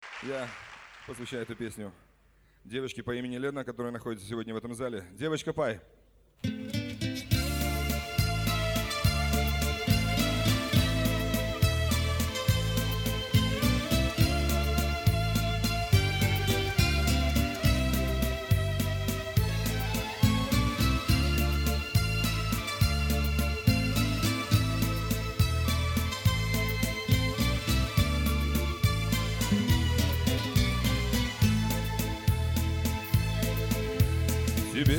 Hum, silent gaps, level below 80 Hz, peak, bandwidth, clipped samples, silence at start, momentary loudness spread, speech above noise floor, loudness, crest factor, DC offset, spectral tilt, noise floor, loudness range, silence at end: none; none; -34 dBFS; -10 dBFS; 19 kHz; under 0.1%; 0 s; 10 LU; 27 dB; -29 LUFS; 18 dB; under 0.1%; -5 dB/octave; -63 dBFS; 8 LU; 0 s